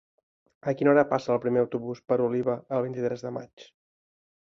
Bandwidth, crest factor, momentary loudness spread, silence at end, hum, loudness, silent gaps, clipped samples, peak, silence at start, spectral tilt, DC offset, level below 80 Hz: 7.2 kHz; 20 dB; 13 LU; 0.9 s; none; -27 LUFS; 3.53-3.57 s; under 0.1%; -8 dBFS; 0.65 s; -8 dB/octave; under 0.1%; -68 dBFS